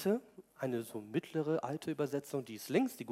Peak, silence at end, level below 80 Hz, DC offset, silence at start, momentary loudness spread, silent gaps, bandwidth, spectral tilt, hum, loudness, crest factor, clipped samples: -18 dBFS; 0 s; -84 dBFS; under 0.1%; 0 s; 7 LU; none; 16 kHz; -6 dB/octave; none; -38 LUFS; 20 dB; under 0.1%